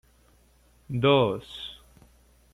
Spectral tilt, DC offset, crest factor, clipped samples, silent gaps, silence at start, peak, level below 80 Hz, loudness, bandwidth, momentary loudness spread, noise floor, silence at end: -7 dB/octave; under 0.1%; 22 dB; under 0.1%; none; 0.9 s; -6 dBFS; -56 dBFS; -24 LUFS; 14 kHz; 18 LU; -60 dBFS; 0.8 s